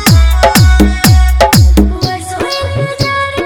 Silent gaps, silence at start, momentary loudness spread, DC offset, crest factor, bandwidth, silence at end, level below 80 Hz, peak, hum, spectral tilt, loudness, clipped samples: none; 0 s; 9 LU; under 0.1%; 8 dB; over 20 kHz; 0 s; -12 dBFS; 0 dBFS; none; -5 dB/octave; -9 LUFS; 1%